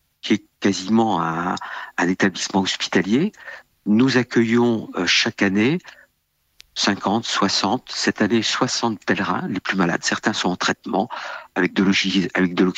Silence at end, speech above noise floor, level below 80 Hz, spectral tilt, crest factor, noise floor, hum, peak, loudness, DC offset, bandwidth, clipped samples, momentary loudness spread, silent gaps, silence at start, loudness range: 0.05 s; 48 dB; -62 dBFS; -4 dB/octave; 16 dB; -68 dBFS; none; -4 dBFS; -20 LUFS; under 0.1%; 9.2 kHz; under 0.1%; 8 LU; none; 0.25 s; 2 LU